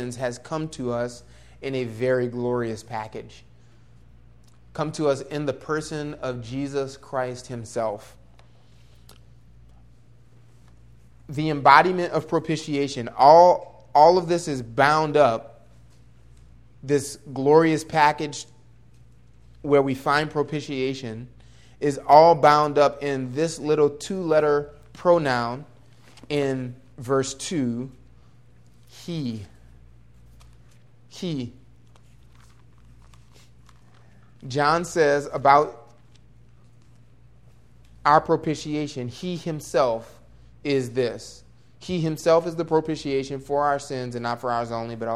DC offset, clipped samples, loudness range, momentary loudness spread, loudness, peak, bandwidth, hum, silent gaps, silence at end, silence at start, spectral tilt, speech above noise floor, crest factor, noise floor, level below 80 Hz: 0.2%; under 0.1%; 17 LU; 17 LU; -22 LUFS; 0 dBFS; 14 kHz; none; none; 0 s; 0 s; -5.5 dB/octave; 32 dB; 24 dB; -54 dBFS; -56 dBFS